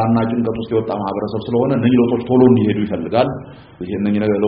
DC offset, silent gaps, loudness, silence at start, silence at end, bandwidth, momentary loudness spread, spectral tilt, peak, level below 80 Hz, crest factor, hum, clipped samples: under 0.1%; none; -17 LUFS; 0 s; 0 s; 5 kHz; 9 LU; -7.5 dB/octave; 0 dBFS; -48 dBFS; 16 dB; none; under 0.1%